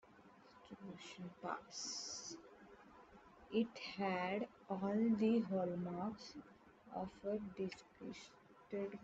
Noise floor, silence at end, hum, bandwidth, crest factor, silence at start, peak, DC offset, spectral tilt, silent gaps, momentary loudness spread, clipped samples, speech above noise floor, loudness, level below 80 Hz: -65 dBFS; 0 s; none; 8 kHz; 18 dB; 0.05 s; -26 dBFS; under 0.1%; -5 dB/octave; none; 25 LU; under 0.1%; 23 dB; -43 LUFS; -78 dBFS